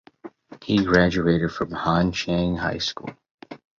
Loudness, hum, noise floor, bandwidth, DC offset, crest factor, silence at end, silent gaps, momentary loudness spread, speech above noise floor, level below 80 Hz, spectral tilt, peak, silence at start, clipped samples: -22 LUFS; none; -44 dBFS; 7.4 kHz; under 0.1%; 20 dB; 0.25 s; 3.31-3.38 s; 21 LU; 22 dB; -44 dBFS; -6 dB/octave; -2 dBFS; 0.25 s; under 0.1%